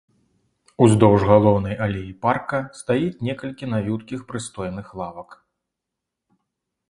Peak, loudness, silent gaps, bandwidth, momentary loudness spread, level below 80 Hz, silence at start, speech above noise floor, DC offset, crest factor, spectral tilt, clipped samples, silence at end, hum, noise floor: 0 dBFS; -21 LUFS; none; 11.5 kHz; 17 LU; -46 dBFS; 0.8 s; 63 dB; under 0.1%; 22 dB; -7 dB/octave; under 0.1%; 1.55 s; none; -83 dBFS